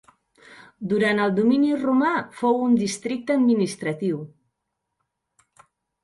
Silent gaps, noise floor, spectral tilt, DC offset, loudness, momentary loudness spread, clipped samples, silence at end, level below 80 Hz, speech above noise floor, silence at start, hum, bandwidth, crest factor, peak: none; -80 dBFS; -5.5 dB/octave; under 0.1%; -22 LUFS; 8 LU; under 0.1%; 1.75 s; -68 dBFS; 59 dB; 0.5 s; none; 11.5 kHz; 16 dB; -8 dBFS